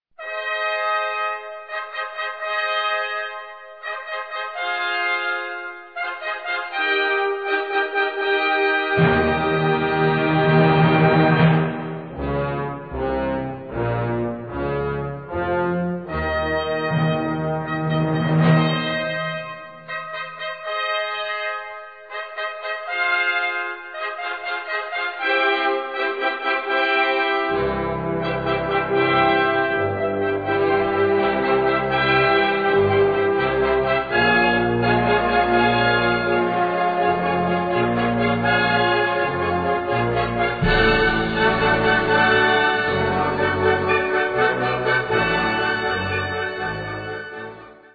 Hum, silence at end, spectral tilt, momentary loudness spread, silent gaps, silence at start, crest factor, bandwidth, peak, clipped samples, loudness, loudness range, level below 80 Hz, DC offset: none; 0.2 s; -8.5 dB/octave; 12 LU; none; 0.2 s; 16 dB; 4.9 kHz; -4 dBFS; under 0.1%; -20 LUFS; 7 LU; -42 dBFS; 0.1%